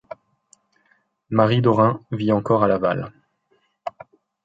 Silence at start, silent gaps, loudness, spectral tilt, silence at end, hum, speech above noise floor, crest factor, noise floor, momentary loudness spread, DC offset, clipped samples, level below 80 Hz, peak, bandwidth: 1.3 s; none; -20 LUFS; -8.5 dB/octave; 0.55 s; none; 48 dB; 20 dB; -66 dBFS; 19 LU; under 0.1%; under 0.1%; -56 dBFS; -2 dBFS; 7.8 kHz